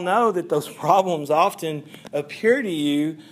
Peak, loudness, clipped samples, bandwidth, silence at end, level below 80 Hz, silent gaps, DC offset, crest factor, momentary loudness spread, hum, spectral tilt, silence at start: -4 dBFS; -22 LUFS; under 0.1%; 15.5 kHz; 0.1 s; -76 dBFS; none; under 0.1%; 18 dB; 10 LU; none; -5.5 dB/octave; 0 s